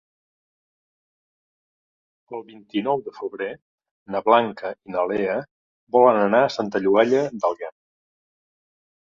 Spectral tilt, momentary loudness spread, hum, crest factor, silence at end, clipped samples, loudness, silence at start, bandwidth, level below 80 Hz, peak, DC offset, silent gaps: -6 dB/octave; 17 LU; none; 22 dB; 1.45 s; under 0.1%; -21 LUFS; 2.3 s; 7.4 kHz; -68 dBFS; -2 dBFS; under 0.1%; 3.62-3.78 s, 3.91-4.06 s, 5.51-5.87 s